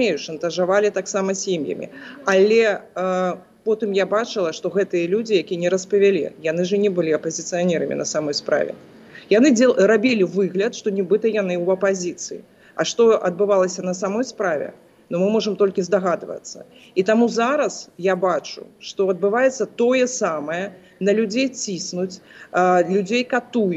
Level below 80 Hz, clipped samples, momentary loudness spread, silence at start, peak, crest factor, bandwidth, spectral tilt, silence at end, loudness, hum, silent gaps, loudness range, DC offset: -72 dBFS; under 0.1%; 11 LU; 0 s; -6 dBFS; 14 dB; 8.2 kHz; -4.5 dB/octave; 0 s; -20 LUFS; none; none; 3 LU; under 0.1%